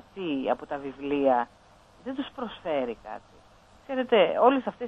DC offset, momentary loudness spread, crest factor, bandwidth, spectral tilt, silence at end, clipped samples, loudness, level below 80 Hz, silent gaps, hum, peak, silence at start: under 0.1%; 16 LU; 20 dB; 7.8 kHz; -6.5 dB/octave; 0 s; under 0.1%; -27 LUFS; -62 dBFS; none; none; -8 dBFS; 0.15 s